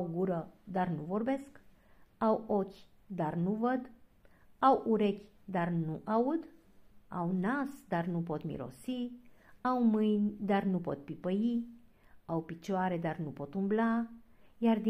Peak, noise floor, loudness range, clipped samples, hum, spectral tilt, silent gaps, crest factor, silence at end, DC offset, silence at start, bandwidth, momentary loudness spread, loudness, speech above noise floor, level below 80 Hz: -14 dBFS; -61 dBFS; 3 LU; under 0.1%; none; -8.5 dB/octave; none; 20 dB; 0 s; under 0.1%; 0 s; 11 kHz; 11 LU; -34 LUFS; 29 dB; -68 dBFS